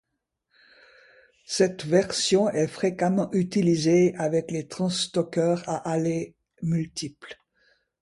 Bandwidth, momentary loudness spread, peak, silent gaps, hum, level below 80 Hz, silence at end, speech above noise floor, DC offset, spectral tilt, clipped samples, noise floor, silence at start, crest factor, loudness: 11.5 kHz; 12 LU; -8 dBFS; none; none; -64 dBFS; 0.7 s; 55 dB; under 0.1%; -5.5 dB/octave; under 0.1%; -79 dBFS; 1.5 s; 18 dB; -25 LUFS